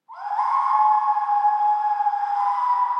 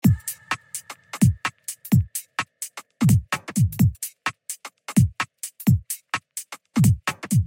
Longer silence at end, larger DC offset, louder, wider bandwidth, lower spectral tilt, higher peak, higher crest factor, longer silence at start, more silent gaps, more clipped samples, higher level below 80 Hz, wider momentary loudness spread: about the same, 0 s vs 0 s; neither; about the same, -21 LUFS vs -23 LUFS; second, 6.2 kHz vs 17 kHz; second, 1.5 dB/octave vs -5.5 dB/octave; about the same, -8 dBFS vs -6 dBFS; second, 12 dB vs 18 dB; about the same, 0.1 s vs 0.05 s; neither; neither; second, under -90 dBFS vs -44 dBFS; second, 4 LU vs 15 LU